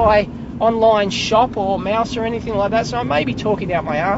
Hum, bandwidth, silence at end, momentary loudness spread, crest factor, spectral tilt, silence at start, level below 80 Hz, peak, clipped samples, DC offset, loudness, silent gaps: none; 8 kHz; 0 s; 6 LU; 16 dB; -5.5 dB/octave; 0 s; -38 dBFS; -2 dBFS; under 0.1%; under 0.1%; -18 LUFS; none